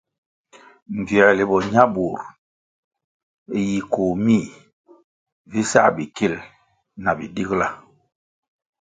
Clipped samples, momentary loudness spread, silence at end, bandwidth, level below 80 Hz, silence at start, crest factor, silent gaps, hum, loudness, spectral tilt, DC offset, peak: under 0.1%; 16 LU; 1.05 s; 9.4 kHz; -54 dBFS; 0.9 s; 22 dB; 2.38-2.91 s, 3.04-3.46 s, 4.73-4.84 s, 5.04-5.26 s, 5.32-5.45 s; none; -20 LUFS; -5.5 dB/octave; under 0.1%; 0 dBFS